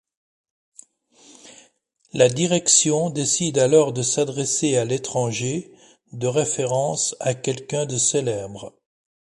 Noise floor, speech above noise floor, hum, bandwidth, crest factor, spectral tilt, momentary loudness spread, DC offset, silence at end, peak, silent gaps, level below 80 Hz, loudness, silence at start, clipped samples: -61 dBFS; 40 dB; none; 11.5 kHz; 20 dB; -3.5 dB/octave; 13 LU; under 0.1%; 0.6 s; -2 dBFS; none; -62 dBFS; -20 LUFS; 1.45 s; under 0.1%